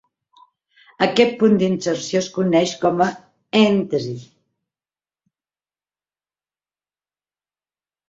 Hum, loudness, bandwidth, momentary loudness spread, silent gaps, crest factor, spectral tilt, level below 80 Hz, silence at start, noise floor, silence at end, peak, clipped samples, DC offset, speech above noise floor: 50 Hz at -45 dBFS; -18 LUFS; 7.8 kHz; 8 LU; none; 20 dB; -5.5 dB/octave; -62 dBFS; 1 s; under -90 dBFS; 3.85 s; -2 dBFS; under 0.1%; under 0.1%; over 72 dB